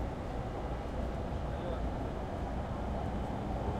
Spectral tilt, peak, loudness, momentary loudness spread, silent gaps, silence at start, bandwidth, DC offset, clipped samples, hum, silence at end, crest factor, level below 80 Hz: -8 dB/octave; -22 dBFS; -38 LUFS; 2 LU; none; 0 s; 11 kHz; under 0.1%; under 0.1%; none; 0 s; 14 dB; -40 dBFS